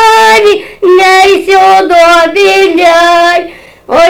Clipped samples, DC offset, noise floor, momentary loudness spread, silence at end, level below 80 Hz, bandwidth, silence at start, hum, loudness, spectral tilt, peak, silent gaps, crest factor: 2%; under 0.1%; -25 dBFS; 6 LU; 0 s; -40 dBFS; over 20 kHz; 0 s; none; -5 LUFS; -2 dB/octave; 0 dBFS; none; 4 dB